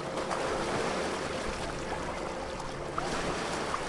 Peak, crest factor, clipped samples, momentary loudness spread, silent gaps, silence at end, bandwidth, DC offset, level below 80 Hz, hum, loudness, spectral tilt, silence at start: -16 dBFS; 18 dB; under 0.1%; 5 LU; none; 0 s; 11.5 kHz; under 0.1%; -48 dBFS; none; -34 LUFS; -4 dB/octave; 0 s